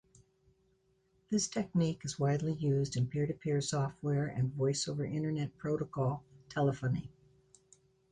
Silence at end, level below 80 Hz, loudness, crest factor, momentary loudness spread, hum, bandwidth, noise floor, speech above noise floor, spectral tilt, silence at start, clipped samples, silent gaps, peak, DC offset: 1 s; -64 dBFS; -35 LUFS; 14 dB; 4 LU; none; 10.5 kHz; -73 dBFS; 40 dB; -6 dB/octave; 1.3 s; under 0.1%; none; -20 dBFS; under 0.1%